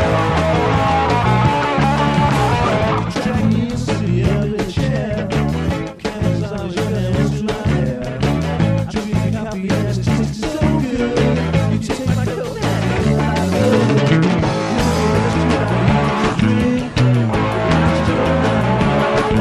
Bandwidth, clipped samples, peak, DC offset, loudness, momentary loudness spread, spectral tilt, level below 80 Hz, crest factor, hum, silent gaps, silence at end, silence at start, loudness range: 14 kHz; under 0.1%; -2 dBFS; under 0.1%; -17 LUFS; 5 LU; -6.5 dB/octave; -30 dBFS; 14 dB; none; none; 0 s; 0 s; 4 LU